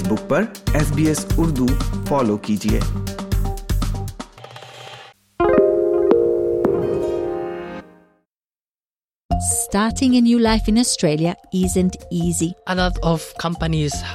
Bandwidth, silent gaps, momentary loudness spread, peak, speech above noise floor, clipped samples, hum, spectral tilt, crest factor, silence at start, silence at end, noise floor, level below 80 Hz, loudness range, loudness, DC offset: 17 kHz; 9.25-9.29 s; 15 LU; -2 dBFS; over 72 dB; under 0.1%; none; -5.5 dB/octave; 18 dB; 0 s; 0 s; under -90 dBFS; -30 dBFS; 6 LU; -19 LUFS; under 0.1%